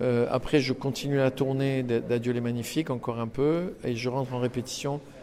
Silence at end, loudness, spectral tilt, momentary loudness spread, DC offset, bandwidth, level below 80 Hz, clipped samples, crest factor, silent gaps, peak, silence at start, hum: 0 s; -28 LUFS; -6 dB/octave; 6 LU; under 0.1%; 15.5 kHz; -52 dBFS; under 0.1%; 18 dB; none; -10 dBFS; 0 s; none